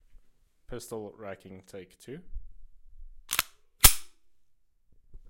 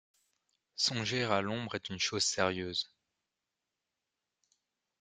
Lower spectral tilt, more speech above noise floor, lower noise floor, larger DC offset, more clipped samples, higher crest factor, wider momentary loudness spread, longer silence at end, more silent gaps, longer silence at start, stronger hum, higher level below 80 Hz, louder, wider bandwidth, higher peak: second, -1 dB/octave vs -3 dB/octave; second, 25 dB vs 55 dB; second, -66 dBFS vs -88 dBFS; neither; neither; first, 32 dB vs 26 dB; first, 27 LU vs 8 LU; second, 0.15 s vs 2.15 s; neither; about the same, 0.7 s vs 0.75 s; neither; first, -40 dBFS vs -74 dBFS; first, -24 LUFS vs -33 LUFS; first, 16.5 kHz vs 11.5 kHz; first, 0 dBFS vs -12 dBFS